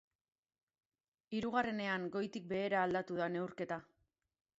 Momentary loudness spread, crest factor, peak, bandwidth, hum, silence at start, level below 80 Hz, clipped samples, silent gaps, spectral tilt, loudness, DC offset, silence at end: 8 LU; 20 dB; -20 dBFS; 7.6 kHz; none; 1.3 s; -76 dBFS; under 0.1%; none; -4 dB/octave; -39 LUFS; under 0.1%; 0.75 s